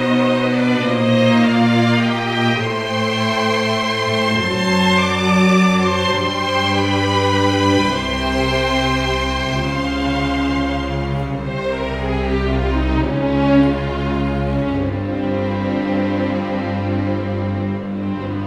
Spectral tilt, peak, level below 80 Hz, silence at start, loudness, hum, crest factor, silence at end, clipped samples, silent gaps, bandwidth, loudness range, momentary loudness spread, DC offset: -6 dB/octave; -4 dBFS; -30 dBFS; 0 s; -17 LUFS; none; 14 dB; 0 s; under 0.1%; none; 13.5 kHz; 5 LU; 7 LU; under 0.1%